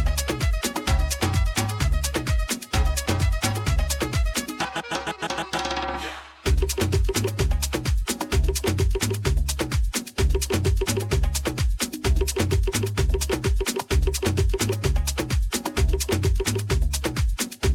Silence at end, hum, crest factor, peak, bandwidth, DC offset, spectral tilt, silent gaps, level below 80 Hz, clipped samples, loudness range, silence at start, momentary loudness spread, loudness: 0 s; none; 16 dB; -8 dBFS; 17 kHz; under 0.1%; -4.5 dB/octave; none; -26 dBFS; under 0.1%; 2 LU; 0 s; 4 LU; -25 LUFS